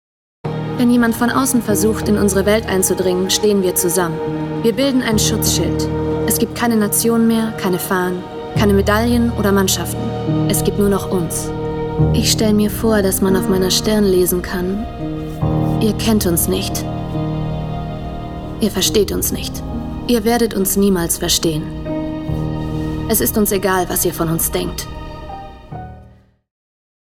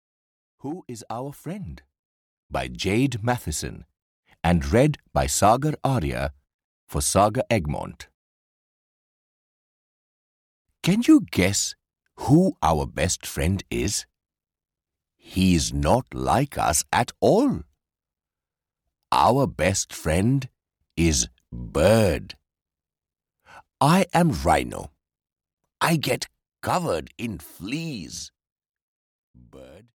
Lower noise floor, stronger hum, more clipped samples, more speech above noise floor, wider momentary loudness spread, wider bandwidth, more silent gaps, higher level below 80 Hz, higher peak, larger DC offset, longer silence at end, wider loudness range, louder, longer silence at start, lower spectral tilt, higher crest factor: second, -46 dBFS vs under -90 dBFS; neither; neither; second, 30 dB vs over 68 dB; second, 10 LU vs 16 LU; about the same, 18 kHz vs 18.5 kHz; second, none vs 1.99-2.49 s, 4.02-4.23 s, 6.54-6.87 s, 8.14-10.65 s, 28.52-28.56 s, 28.82-29.34 s; first, -32 dBFS vs -40 dBFS; first, 0 dBFS vs -6 dBFS; neither; first, 0.95 s vs 0.35 s; second, 4 LU vs 7 LU; first, -16 LUFS vs -23 LUFS; second, 0.45 s vs 0.65 s; about the same, -4.5 dB/octave vs -5 dB/octave; about the same, 16 dB vs 20 dB